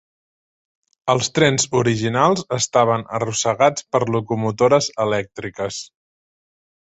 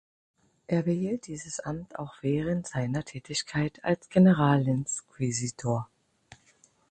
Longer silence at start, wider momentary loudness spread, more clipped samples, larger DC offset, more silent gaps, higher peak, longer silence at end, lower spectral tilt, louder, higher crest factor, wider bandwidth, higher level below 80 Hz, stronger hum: first, 1.05 s vs 0.7 s; second, 11 LU vs 14 LU; neither; neither; neither; first, -2 dBFS vs -10 dBFS; about the same, 1.05 s vs 1.05 s; second, -4 dB/octave vs -6 dB/octave; first, -19 LUFS vs -28 LUFS; about the same, 18 dB vs 20 dB; second, 8.2 kHz vs 9.2 kHz; about the same, -56 dBFS vs -60 dBFS; neither